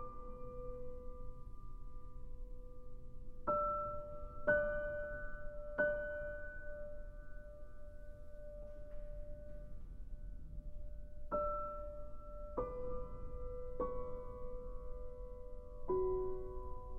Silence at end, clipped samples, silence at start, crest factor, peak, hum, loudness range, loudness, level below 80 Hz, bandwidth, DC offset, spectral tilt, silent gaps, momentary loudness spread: 0 s; under 0.1%; 0 s; 20 dB; -22 dBFS; none; 14 LU; -44 LUFS; -48 dBFS; 3.2 kHz; under 0.1%; -9 dB/octave; none; 19 LU